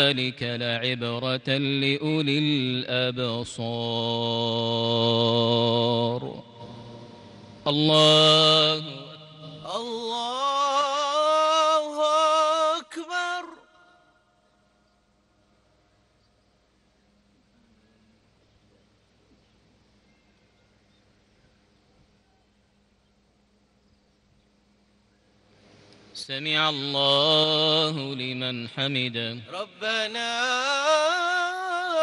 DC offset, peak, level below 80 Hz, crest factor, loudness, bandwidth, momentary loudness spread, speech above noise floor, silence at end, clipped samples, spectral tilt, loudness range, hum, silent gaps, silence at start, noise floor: under 0.1%; -6 dBFS; -70 dBFS; 20 dB; -23 LUFS; 11.5 kHz; 15 LU; 42 dB; 0 s; under 0.1%; -4 dB/octave; 7 LU; none; none; 0 s; -66 dBFS